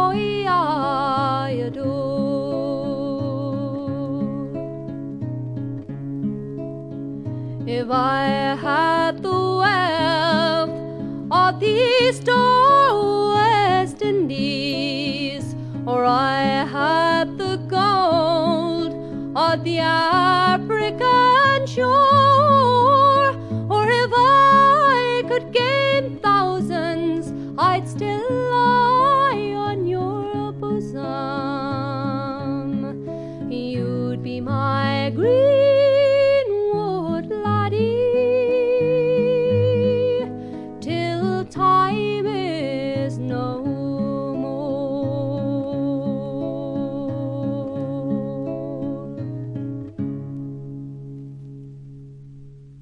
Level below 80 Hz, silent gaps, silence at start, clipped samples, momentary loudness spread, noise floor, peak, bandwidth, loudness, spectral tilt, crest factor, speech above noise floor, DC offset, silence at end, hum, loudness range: -56 dBFS; none; 0 s; under 0.1%; 15 LU; -41 dBFS; -4 dBFS; 12 kHz; -20 LUFS; -6.5 dB/octave; 16 dB; 24 dB; under 0.1%; 0 s; none; 12 LU